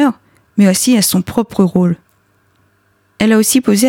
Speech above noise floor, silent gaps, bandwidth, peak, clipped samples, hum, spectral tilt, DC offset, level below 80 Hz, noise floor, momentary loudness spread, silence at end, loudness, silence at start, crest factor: 45 dB; none; 18 kHz; -2 dBFS; under 0.1%; none; -4.5 dB/octave; under 0.1%; -48 dBFS; -57 dBFS; 9 LU; 0 s; -13 LUFS; 0 s; 12 dB